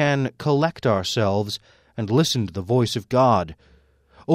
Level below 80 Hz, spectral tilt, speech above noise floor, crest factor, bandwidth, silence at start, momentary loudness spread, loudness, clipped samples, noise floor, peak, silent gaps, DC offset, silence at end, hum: -54 dBFS; -5.5 dB/octave; 33 dB; 18 dB; 16 kHz; 0 s; 13 LU; -22 LUFS; under 0.1%; -54 dBFS; -4 dBFS; none; under 0.1%; 0 s; none